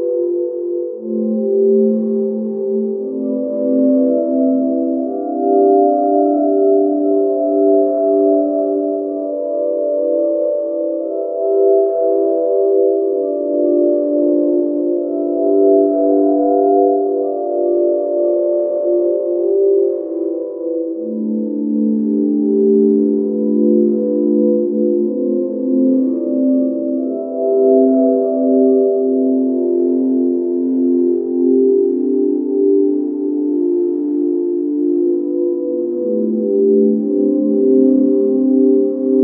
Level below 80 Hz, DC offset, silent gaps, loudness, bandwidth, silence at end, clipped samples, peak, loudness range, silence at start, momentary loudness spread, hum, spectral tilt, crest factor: -74 dBFS; under 0.1%; none; -15 LUFS; 1.5 kHz; 0 s; under 0.1%; -2 dBFS; 3 LU; 0 s; 7 LU; none; -15 dB/octave; 14 dB